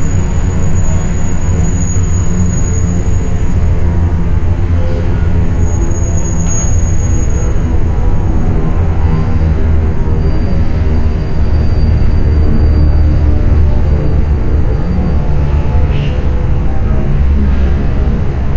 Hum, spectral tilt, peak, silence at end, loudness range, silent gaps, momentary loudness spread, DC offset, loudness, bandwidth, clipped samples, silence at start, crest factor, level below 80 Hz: none; -7 dB/octave; 0 dBFS; 0 s; 2 LU; none; 3 LU; under 0.1%; -13 LUFS; 7.4 kHz; under 0.1%; 0 s; 8 dB; -12 dBFS